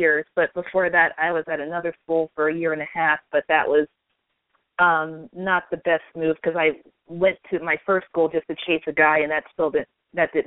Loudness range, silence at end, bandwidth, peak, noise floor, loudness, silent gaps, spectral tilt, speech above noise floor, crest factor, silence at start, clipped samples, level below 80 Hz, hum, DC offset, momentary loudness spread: 2 LU; 0.05 s; 4 kHz; -4 dBFS; -75 dBFS; -22 LUFS; none; -2.5 dB/octave; 53 dB; 20 dB; 0 s; under 0.1%; -62 dBFS; none; under 0.1%; 9 LU